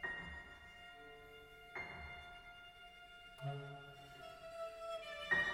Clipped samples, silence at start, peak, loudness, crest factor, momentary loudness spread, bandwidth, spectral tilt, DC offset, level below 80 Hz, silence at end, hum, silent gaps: under 0.1%; 0 s; -24 dBFS; -48 LUFS; 24 dB; 11 LU; 16 kHz; -4.5 dB/octave; under 0.1%; -66 dBFS; 0 s; none; none